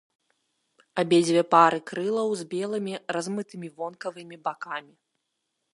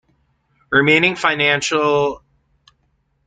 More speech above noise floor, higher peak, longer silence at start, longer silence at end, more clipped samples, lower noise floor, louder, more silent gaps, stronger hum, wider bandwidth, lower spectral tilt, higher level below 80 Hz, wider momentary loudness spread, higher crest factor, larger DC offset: first, 54 dB vs 49 dB; about the same, -4 dBFS vs -2 dBFS; first, 0.95 s vs 0.7 s; second, 0.95 s vs 1.1 s; neither; first, -79 dBFS vs -65 dBFS; second, -26 LUFS vs -15 LUFS; neither; neither; first, 11.5 kHz vs 9.4 kHz; about the same, -5 dB/octave vs -4 dB/octave; second, -78 dBFS vs -56 dBFS; first, 17 LU vs 7 LU; first, 24 dB vs 18 dB; neither